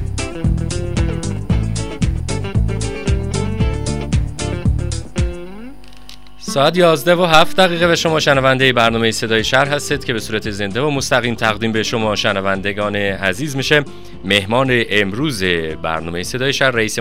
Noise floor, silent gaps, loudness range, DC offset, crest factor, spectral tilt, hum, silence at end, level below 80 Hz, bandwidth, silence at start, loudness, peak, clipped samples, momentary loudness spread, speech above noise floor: -40 dBFS; none; 7 LU; 3%; 16 dB; -4.5 dB/octave; none; 0 s; -28 dBFS; 16 kHz; 0 s; -16 LUFS; 0 dBFS; under 0.1%; 10 LU; 25 dB